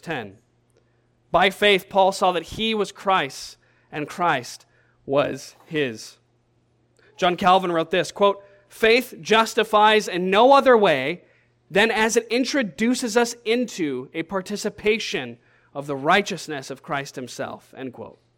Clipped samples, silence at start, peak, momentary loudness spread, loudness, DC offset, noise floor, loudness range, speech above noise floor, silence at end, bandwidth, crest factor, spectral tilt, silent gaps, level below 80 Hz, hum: under 0.1%; 0.05 s; -4 dBFS; 19 LU; -21 LUFS; under 0.1%; -64 dBFS; 9 LU; 43 dB; 0.3 s; 17 kHz; 18 dB; -3.5 dB/octave; none; -56 dBFS; none